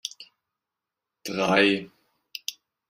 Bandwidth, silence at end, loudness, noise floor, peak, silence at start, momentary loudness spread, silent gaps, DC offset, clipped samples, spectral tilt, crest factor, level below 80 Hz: 16 kHz; 0.35 s; -24 LUFS; -87 dBFS; -6 dBFS; 0.05 s; 19 LU; none; under 0.1%; under 0.1%; -4 dB/octave; 24 dB; -70 dBFS